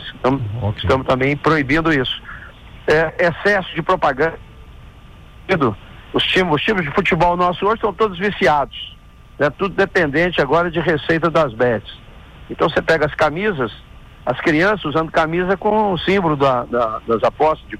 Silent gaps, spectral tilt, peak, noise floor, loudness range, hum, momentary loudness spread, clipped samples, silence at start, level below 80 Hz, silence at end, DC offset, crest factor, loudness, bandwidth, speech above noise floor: none; -6.5 dB/octave; -6 dBFS; -41 dBFS; 2 LU; none; 9 LU; under 0.1%; 0 s; -40 dBFS; 0 s; under 0.1%; 12 dB; -17 LUFS; 14 kHz; 24 dB